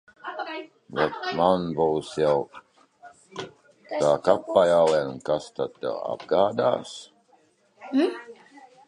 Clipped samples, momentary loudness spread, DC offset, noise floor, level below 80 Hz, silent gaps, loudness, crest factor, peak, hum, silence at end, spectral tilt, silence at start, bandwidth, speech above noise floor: under 0.1%; 18 LU; under 0.1%; -62 dBFS; -62 dBFS; none; -24 LUFS; 22 dB; -4 dBFS; none; 0.3 s; -5.5 dB/octave; 0.25 s; 11 kHz; 38 dB